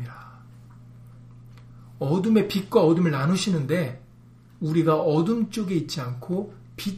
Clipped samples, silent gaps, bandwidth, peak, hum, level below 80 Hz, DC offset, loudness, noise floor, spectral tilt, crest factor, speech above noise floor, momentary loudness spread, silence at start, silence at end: under 0.1%; none; 15.5 kHz; -6 dBFS; 60 Hz at -50 dBFS; -58 dBFS; under 0.1%; -24 LUFS; -50 dBFS; -6.5 dB/octave; 18 dB; 28 dB; 13 LU; 0 s; 0 s